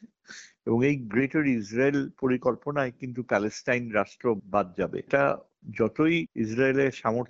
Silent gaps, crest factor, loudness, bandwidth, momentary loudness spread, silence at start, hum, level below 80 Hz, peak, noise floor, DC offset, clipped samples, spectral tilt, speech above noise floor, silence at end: none; 18 dB; -27 LUFS; 7.8 kHz; 8 LU; 0.05 s; none; -62 dBFS; -10 dBFS; -49 dBFS; under 0.1%; under 0.1%; -5.5 dB/octave; 23 dB; 0.05 s